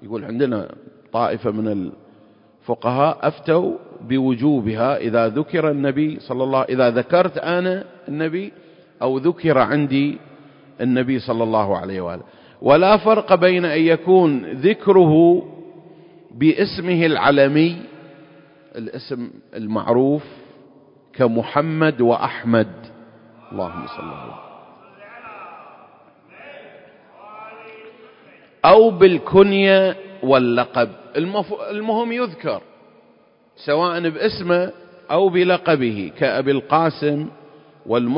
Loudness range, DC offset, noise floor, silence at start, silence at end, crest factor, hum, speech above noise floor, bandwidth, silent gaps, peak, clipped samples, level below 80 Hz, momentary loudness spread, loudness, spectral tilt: 8 LU; under 0.1%; -54 dBFS; 0 s; 0 s; 18 dB; none; 37 dB; 5.4 kHz; none; 0 dBFS; under 0.1%; -56 dBFS; 19 LU; -18 LUFS; -11.5 dB/octave